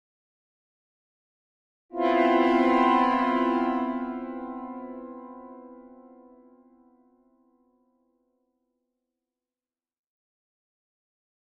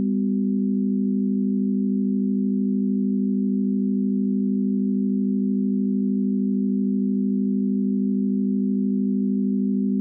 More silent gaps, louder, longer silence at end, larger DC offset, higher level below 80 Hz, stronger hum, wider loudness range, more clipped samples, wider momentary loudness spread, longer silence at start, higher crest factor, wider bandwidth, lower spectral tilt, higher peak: neither; about the same, -24 LUFS vs -23 LUFS; first, 5.55 s vs 0 s; neither; first, -64 dBFS vs -82 dBFS; second, none vs 50 Hz at -25 dBFS; first, 19 LU vs 0 LU; neither; first, 22 LU vs 0 LU; first, 1.9 s vs 0 s; first, 20 dB vs 6 dB; first, 7.6 kHz vs 0.5 kHz; second, -5.5 dB/octave vs -18 dB/octave; first, -10 dBFS vs -14 dBFS